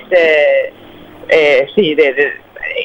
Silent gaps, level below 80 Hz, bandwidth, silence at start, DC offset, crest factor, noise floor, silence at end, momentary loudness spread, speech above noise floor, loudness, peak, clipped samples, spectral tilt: none; -50 dBFS; 16.5 kHz; 0 s; under 0.1%; 12 dB; -35 dBFS; 0 s; 14 LU; 25 dB; -11 LUFS; 0 dBFS; under 0.1%; -5 dB/octave